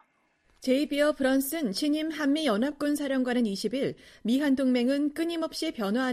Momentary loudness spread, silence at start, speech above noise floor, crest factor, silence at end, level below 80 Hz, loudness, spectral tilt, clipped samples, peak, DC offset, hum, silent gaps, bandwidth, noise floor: 6 LU; 0.6 s; 41 dB; 14 dB; 0 s; -62 dBFS; -28 LUFS; -4.5 dB/octave; under 0.1%; -12 dBFS; under 0.1%; none; none; 14.5 kHz; -68 dBFS